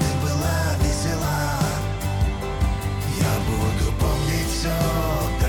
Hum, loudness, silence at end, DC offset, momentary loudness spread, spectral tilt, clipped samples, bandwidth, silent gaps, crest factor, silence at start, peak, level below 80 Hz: none; -23 LUFS; 0 s; under 0.1%; 3 LU; -5 dB/octave; under 0.1%; 19 kHz; none; 12 dB; 0 s; -10 dBFS; -28 dBFS